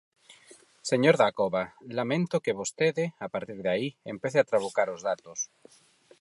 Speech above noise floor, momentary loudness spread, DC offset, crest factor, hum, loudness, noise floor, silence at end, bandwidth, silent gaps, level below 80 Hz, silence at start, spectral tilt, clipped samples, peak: 29 dB; 12 LU; under 0.1%; 22 dB; none; -28 LUFS; -56 dBFS; 0.75 s; 11.5 kHz; none; -72 dBFS; 0.3 s; -4.5 dB/octave; under 0.1%; -6 dBFS